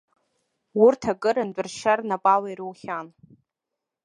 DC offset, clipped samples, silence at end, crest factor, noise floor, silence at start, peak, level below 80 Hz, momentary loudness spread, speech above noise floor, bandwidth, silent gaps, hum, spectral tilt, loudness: under 0.1%; under 0.1%; 0.95 s; 20 dB; -85 dBFS; 0.75 s; -6 dBFS; -66 dBFS; 15 LU; 62 dB; 11 kHz; none; none; -5 dB/octave; -23 LUFS